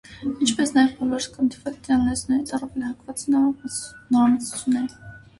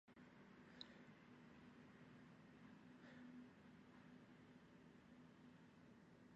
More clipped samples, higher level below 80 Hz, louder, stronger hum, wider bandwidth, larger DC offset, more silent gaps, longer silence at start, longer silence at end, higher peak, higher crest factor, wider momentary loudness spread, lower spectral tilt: neither; first, -50 dBFS vs -86 dBFS; first, -23 LUFS vs -65 LUFS; neither; first, 11.5 kHz vs 8 kHz; neither; neither; about the same, 0.1 s vs 0.05 s; first, 0.2 s vs 0 s; first, -6 dBFS vs -40 dBFS; second, 18 dB vs 24 dB; first, 11 LU vs 6 LU; about the same, -3.5 dB/octave vs -4.5 dB/octave